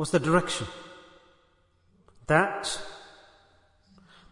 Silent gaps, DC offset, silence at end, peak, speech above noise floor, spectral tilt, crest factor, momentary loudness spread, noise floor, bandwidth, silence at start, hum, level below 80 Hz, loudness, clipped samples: none; under 0.1%; 1.25 s; -6 dBFS; 39 dB; -4.5 dB/octave; 24 dB; 23 LU; -65 dBFS; 11 kHz; 0 s; none; -56 dBFS; -27 LUFS; under 0.1%